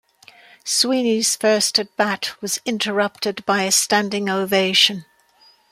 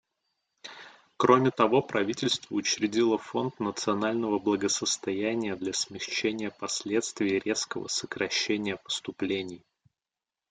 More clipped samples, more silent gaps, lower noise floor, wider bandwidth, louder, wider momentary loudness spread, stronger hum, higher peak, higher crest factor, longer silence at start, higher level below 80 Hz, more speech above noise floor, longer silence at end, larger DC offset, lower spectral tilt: neither; neither; second, -55 dBFS vs under -90 dBFS; first, 16 kHz vs 9.6 kHz; first, -18 LUFS vs -28 LUFS; about the same, 9 LU vs 9 LU; neither; first, -2 dBFS vs -6 dBFS; second, 18 dB vs 24 dB; about the same, 0.65 s vs 0.65 s; about the same, -68 dBFS vs -70 dBFS; second, 35 dB vs over 62 dB; second, 0.7 s vs 0.95 s; neither; second, -2 dB/octave vs -3.5 dB/octave